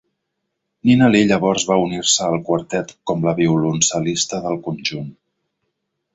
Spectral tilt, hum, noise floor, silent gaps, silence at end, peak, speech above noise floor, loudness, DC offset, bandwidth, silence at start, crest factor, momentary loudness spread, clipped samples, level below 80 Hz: -4 dB/octave; none; -76 dBFS; none; 1.05 s; -2 dBFS; 58 dB; -18 LUFS; under 0.1%; 8 kHz; 0.85 s; 16 dB; 11 LU; under 0.1%; -54 dBFS